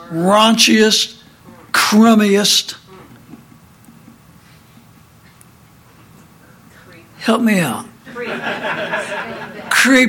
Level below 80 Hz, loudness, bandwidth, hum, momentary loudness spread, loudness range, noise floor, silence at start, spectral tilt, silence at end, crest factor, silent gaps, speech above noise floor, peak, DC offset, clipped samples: -58 dBFS; -14 LUFS; 17 kHz; none; 18 LU; 10 LU; -46 dBFS; 0 s; -3 dB/octave; 0 s; 16 dB; none; 34 dB; 0 dBFS; under 0.1%; under 0.1%